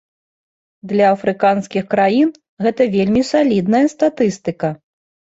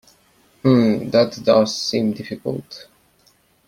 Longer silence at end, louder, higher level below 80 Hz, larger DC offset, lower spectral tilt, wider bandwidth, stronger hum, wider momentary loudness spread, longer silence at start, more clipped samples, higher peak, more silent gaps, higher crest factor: second, 0.55 s vs 0.9 s; first, -16 LUFS vs -19 LUFS; about the same, -54 dBFS vs -58 dBFS; neither; about the same, -6.5 dB/octave vs -6 dB/octave; second, 8 kHz vs 15.5 kHz; neither; second, 7 LU vs 14 LU; first, 0.85 s vs 0.65 s; neither; about the same, -2 dBFS vs -2 dBFS; first, 2.49-2.57 s vs none; about the same, 14 dB vs 18 dB